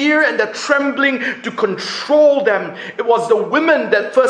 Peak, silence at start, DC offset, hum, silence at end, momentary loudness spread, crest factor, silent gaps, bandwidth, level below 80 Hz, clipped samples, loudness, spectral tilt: 0 dBFS; 0 s; under 0.1%; none; 0 s; 8 LU; 14 dB; none; 10 kHz; -66 dBFS; under 0.1%; -15 LUFS; -4 dB/octave